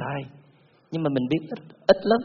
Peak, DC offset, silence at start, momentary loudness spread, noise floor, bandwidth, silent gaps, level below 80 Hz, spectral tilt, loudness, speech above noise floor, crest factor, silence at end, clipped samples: -2 dBFS; under 0.1%; 0 s; 15 LU; -58 dBFS; 6.6 kHz; none; -60 dBFS; -5 dB/octave; -25 LUFS; 35 dB; 22 dB; 0 s; under 0.1%